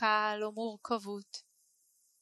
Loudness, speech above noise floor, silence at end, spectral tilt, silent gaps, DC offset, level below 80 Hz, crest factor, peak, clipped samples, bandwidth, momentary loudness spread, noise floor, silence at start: -35 LUFS; 34 dB; 0.8 s; -3.5 dB/octave; none; under 0.1%; -86 dBFS; 20 dB; -16 dBFS; under 0.1%; 12 kHz; 17 LU; -72 dBFS; 0 s